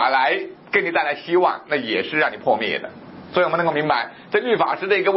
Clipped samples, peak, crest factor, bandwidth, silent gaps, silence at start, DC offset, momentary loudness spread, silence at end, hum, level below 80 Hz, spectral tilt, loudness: under 0.1%; -2 dBFS; 18 dB; 5.8 kHz; none; 0 s; under 0.1%; 6 LU; 0 s; none; -66 dBFS; -9 dB/octave; -20 LUFS